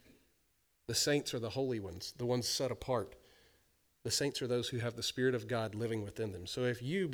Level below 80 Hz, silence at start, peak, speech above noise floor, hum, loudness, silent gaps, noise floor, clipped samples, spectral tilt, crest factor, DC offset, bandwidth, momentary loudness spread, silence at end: -66 dBFS; 0.9 s; -20 dBFS; 40 dB; none; -36 LUFS; none; -76 dBFS; under 0.1%; -4 dB/octave; 18 dB; under 0.1%; over 20 kHz; 8 LU; 0 s